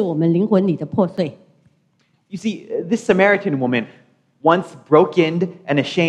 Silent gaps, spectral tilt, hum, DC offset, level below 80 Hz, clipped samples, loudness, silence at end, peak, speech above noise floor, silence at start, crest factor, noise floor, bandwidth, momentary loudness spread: none; -7 dB/octave; none; under 0.1%; -62 dBFS; under 0.1%; -18 LUFS; 0 s; 0 dBFS; 45 dB; 0 s; 18 dB; -62 dBFS; 10 kHz; 11 LU